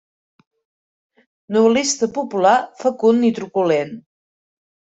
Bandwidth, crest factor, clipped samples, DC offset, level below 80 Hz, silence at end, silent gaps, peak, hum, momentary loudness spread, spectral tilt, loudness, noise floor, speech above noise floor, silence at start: 8.2 kHz; 18 dB; under 0.1%; under 0.1%; -64 dBFS; 0.9 s; none; -2 dBFS; none; 7 LU; -4 dB/octave; -17 LUFS; under -90 dBFS; over 73 dB; 1.5 s